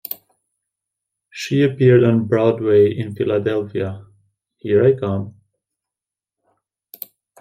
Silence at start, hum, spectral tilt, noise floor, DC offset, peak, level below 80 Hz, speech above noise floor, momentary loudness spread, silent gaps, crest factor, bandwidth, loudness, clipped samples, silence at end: 0.1 s; none; -8 dB/octave; -88 dBFS; under 0.1%; -2 dBFS; -62 dBFS; 72 dB; 22 LU; none; 18 dB; 16 kHz; -17 LUFS; under 0.1%; 2.1 s